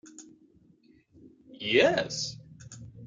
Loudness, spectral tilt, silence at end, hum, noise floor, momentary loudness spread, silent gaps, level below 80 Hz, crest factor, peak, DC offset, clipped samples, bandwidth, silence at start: -27 LUFS; -3.5 dB/octave; 0 s; none; -62 dBFS; 26 LU; none; -64 dBFS; 22 dB; -10 dBFS; under 0.1%; under 0.1%; 9.4 kHz; 0.05 s